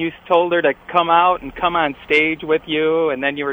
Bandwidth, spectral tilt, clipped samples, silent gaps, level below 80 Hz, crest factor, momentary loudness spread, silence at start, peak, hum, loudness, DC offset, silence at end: over 20 kHz; -6 dB/octave; under 0.1%; none; -50 dBFS; 16 dB; 6 LU; 0 s; -2 dBFS; none; -17 LUFS; under 0.1%; 0 s